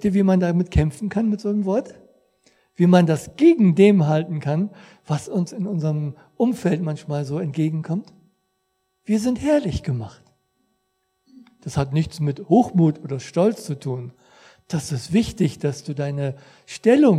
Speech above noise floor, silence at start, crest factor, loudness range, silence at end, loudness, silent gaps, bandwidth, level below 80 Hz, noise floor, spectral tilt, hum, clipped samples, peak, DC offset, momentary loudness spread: 52 dB; 0 s; 20 dB; 7 LU; 0 s; -21 LUFS; none; 13.5 kHz; -42 dBFS; -72 dBFS; -7.5 dB/octave; none; under 0.1%; 0 dBFS; under 0.1%; 14 LU